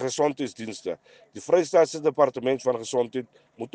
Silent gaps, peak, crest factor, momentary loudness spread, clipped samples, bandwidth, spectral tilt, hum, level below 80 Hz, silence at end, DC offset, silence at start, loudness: none; -6 dBFS; 18 dB; 17 LU; under 0.1%; 9.8 kHz; -4.5 dB/octave; none; -72 dBFS; 0.05 s; under 0.1%; 0 s; -25 LUFS